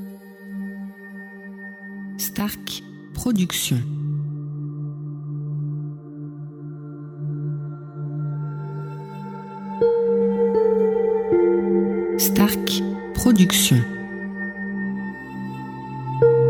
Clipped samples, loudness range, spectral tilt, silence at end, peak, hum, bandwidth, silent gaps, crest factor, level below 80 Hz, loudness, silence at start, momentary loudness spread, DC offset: under 0.1%; 12 LU; -5 dB/octave; 0 s; -4 dBFS; none; 19 kHz; none; 18 dB; -48 dBFS; -22 LUFS; 0 s; 18 LU; under 0.1%